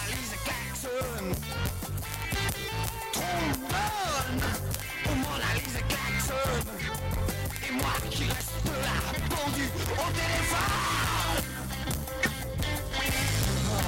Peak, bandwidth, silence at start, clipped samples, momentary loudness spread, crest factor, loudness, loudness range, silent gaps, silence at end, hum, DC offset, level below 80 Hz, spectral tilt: -6 dBFS; 17 kHz; 0 s; under 0.1%; 6 LU; 24 dB; -30 LUFS; 2 LU; none; 0 s; none; under 0.1%; -38 dBFS; -4 dB/octave